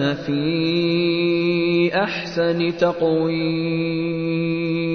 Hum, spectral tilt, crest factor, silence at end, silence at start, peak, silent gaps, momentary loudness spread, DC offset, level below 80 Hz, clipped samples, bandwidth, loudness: none; -7.5 dB/octave; 14 dB; 0 s; 0 s; -6 dBFS; none; 4 LU; under 0.1%; -54 dBFS; under 0.1%; 6.4 kHz; -20 LUFS